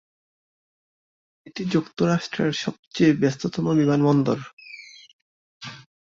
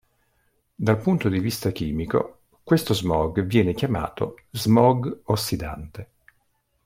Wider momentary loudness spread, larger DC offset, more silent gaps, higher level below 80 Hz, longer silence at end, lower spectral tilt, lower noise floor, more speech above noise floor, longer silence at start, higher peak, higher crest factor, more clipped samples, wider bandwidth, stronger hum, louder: first, 20 LU vs 11 LU; neither; first, 2.79-2.91 s, 4.53-4.57 s, 5.13-5.60 s vs none; second, -62 dBFS vs -46 dBFS; second, 0.35 s vs 0.8 s; about the same, -6.5 dB/octave vs -6.5 dB/octave; second, -44 dBFS vs -69 dBFS; second, 23 dB vs 47 dB; first, 1.45 s vs 0.8 s; about the same, -6 dBFS vs -4 dBFS; about the same, 18 dB vs 20 dB; neither; second, 7.6 kHz vs 16.5 kHz; neither; about the same, -22 LUFS vs -23 LUFS